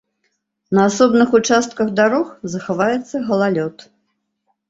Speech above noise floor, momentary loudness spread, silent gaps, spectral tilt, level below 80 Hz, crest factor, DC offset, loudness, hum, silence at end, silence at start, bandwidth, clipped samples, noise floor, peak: 54 dB; 10 LU; none; -5 dB/octave; -58 dBFS; 16 dB; under 0.1%; -17 LUFS; none; 0.85 s; 0.7 s; 8 kHz; under 0.1%; -70 dBFS; -2 dBFS